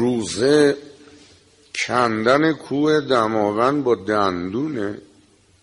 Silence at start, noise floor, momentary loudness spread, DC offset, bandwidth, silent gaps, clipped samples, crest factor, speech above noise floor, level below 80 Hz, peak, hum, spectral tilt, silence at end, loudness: 0 s; -55 dBFS; 10 LU; under 0.1%; 11.5 kHz; none; under 0.1%; 16 dB; 36 dB; -58 dBFS; -4 dBFS; none; -5 dB/octave; 0.6 s; -19 LUFS